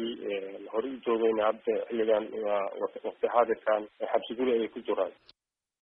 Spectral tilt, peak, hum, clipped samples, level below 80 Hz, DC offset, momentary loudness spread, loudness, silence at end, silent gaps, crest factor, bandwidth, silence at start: -8 dB/octave; -10 dBFS; none; under 0.1%; -72 dBFS; under 0.1%; 8 LU; -30 LUFS; 0.7 s; none; 20 dB; 5.2 kHz; 0 s